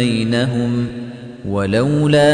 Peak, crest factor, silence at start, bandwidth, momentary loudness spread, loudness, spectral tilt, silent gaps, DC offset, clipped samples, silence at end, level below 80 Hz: -2 dBFS; 14 dB; 0 s; 10 kHz; 16 LU; -17 LUFS; -6.5 dB/octave; none; under 0.1%; under 0.1%; 0 s; -44 dBFS